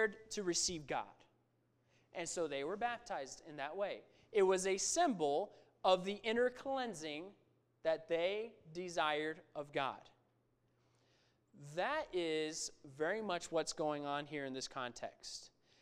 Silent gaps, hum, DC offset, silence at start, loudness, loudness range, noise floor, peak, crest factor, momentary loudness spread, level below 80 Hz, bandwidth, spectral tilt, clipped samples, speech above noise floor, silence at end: none; none; under 0.1%; 0 s; -40 LUFS; 7 LU; -78 dBFS; -18 dBFS; 22 dB; 14 LU; -74 dBFS; 15 kHz; -3 dB/octave; under 0.1%; 38 dB; 0.35 s